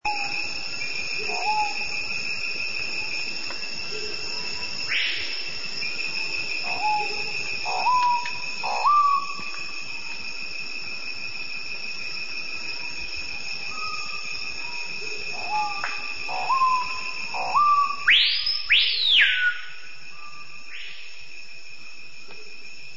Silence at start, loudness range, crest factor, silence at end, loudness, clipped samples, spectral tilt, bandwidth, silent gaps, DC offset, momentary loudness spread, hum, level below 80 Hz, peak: 0 s; 11 LU; 18 dB; 0 s; -24 LUFS; under 0.1%; 0 dB/octave; 8 kHz; none; 3%; 21 LU; none; -58 dBFS; -8 dBFS